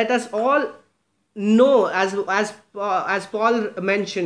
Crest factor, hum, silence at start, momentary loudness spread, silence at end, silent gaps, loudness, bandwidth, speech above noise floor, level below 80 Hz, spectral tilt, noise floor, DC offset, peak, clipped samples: 16 dB; none; 0 s; 12 LU; 0 s; none; -20 LUFS; 10.5 kHz; 48 dB; -74 dBFS; -5 dB/octave; -68 dBFS; under 0.1%; -4 dBFS; under 0.1%